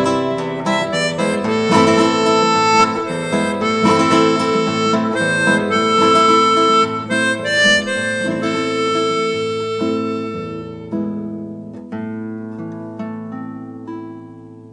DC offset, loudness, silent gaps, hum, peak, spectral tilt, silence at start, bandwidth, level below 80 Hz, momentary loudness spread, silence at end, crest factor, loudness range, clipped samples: under 0.1%; -16 LUFS; none; none; 0 dBFS; -4.5 dB/octave; 0 s; 10 kHz; -56 dBFS; 17 LU; 0 s; 16 dB; 13 LU; under 0.1%